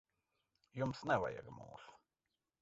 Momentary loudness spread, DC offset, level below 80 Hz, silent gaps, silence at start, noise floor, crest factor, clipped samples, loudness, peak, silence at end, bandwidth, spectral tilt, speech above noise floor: 20 LU; under 0.1%; -70 dBFS; none; 0.75 s; under -90 dBFS; 22 dB; under 0.1%; -40 LUFS; -22 dBFS; 0.65 s; 7.6 kHz; -5 dB/octave; over 49 dB